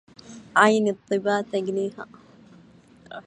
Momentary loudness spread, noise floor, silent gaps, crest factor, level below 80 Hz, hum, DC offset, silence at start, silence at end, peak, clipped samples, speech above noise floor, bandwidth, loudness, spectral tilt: 24 LU; -52 dBFS; none; 24 dB; -70 dBFS; none; under 0.1%; 0.3 s; 0.05 s; -2 dBFS; under 0.1%; 30 dB; 11 kHz; -23 LUFS; -5 dB/octave